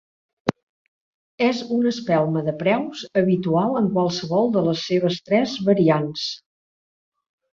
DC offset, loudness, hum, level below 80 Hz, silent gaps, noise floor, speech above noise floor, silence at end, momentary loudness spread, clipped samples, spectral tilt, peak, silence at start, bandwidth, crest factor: under 0.1%; -21 LUFS; none; -62 dBFS; 0.63-1.38 s; under -90 dBFS; over 70 dB; 1.2 s; 9 LU; under 0.1%; -6.5 dB/octave; -2 dBFS; 0.45 s; 7.4 kHz; 20 dB